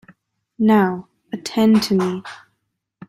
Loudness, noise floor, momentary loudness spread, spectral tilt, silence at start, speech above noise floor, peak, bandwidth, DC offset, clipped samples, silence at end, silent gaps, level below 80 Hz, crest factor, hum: -18 LUFS; -74 dBFS; 17 LU; -6 dB/octave; 0.6 s; 57 dB; -6 dBFS; 14 kHz; under 0.1%; under 0.1%; 0.75 s; none; -60 dBFS; 14 dB; none